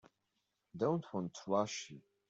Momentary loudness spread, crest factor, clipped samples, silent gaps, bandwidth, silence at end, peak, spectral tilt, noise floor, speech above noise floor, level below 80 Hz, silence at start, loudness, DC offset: 13 LU; 20 dB; under 0.1%; none; 8 kHz; 0.3 s; -20 dBFS; -5.5 dB/octave; -85 dBFS; 47 dB; -80 dBFS; 0.75 s; -38 LUFS; under 0.1%